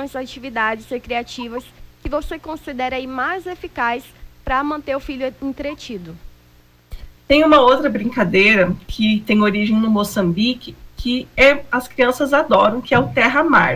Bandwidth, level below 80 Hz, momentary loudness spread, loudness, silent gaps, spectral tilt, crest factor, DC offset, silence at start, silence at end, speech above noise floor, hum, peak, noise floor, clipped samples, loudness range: 16 kHz; -40 dBFS; 16 LU; -17 LUFS; none; -5.5 dB/octave; 16 dB; under 0.1%; 0 s; 0 s; 33 dB; 60 Hz at -45 dBFS; -2 dBFS; -50 dBFS; under 0.1%; 10 LU